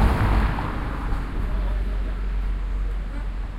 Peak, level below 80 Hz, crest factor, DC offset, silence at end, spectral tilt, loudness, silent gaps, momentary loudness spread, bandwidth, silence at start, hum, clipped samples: -8 dBFS; -24 dBFS; 16 dB; under 0.1%; 0 s; -7.5 dB/octave; -27 LUFS; none; 9 LU; 5.4 kHz; 0 s; none; under 0.1%